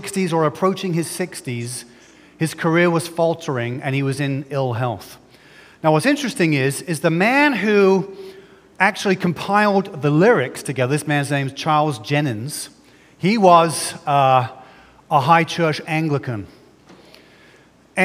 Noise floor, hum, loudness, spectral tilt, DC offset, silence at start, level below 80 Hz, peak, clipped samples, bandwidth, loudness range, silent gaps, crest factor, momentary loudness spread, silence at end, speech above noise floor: -51 dBFS; none; -18 LUFS; -5.5 dB/octave; under 0.1%; 0 s; -64 dBFS; 0 dBFS; under 0.1%; 16 kHz; 4 LU; none; 18 dB; 12 LU; 0 s; 32 dB